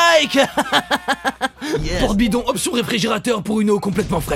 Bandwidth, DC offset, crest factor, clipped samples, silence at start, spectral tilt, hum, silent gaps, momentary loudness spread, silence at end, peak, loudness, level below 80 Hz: 16.5 kHz; under 0.1%; 14 dB; under 0.1%; 0 s; -4 dB/octave; none; none; 6 LU; 0 s; -4 dBFS; -18 LUFS; -34 dBFS